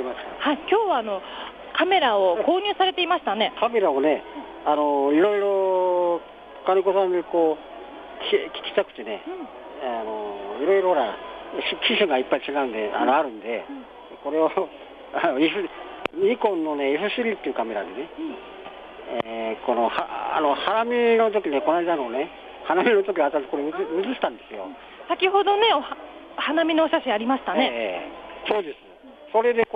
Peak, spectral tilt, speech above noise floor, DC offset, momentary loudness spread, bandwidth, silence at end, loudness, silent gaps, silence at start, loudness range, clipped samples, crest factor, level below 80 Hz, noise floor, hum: -6 dBFS; -6 dB/octave; 23 dB; under 0.1%; 16 LU; 5 kHz; 0.1 s; -23 LUFS; none; 0 s; 5 LU; under 0.1%; 16 dB; -62 dBFS; -46 dBFS; none